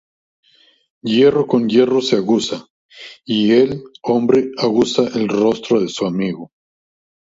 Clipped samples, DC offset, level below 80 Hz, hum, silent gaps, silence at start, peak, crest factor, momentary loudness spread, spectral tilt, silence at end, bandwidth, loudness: under 0.1%; under 0.1%; -58 dBFS; none; 2.70-2.89 s; 1.05 s; -2 dBFS; 16 dB; 14 LU; -5.5 dB/octave; 0.85 s; 7.8 kHz; -16 LUFS